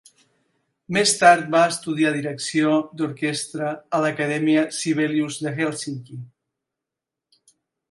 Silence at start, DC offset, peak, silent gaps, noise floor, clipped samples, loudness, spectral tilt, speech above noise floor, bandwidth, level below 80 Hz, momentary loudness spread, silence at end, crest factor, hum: 0.9 s; under 0.1%; 0 dBFS; none; -86 dBFS; under 0.1%; -21 LUFS; -4 dB/octave; 65 dB; 11.5 kHz; -70 dBFS; 13 LU; 1.65 s; 22 dB; none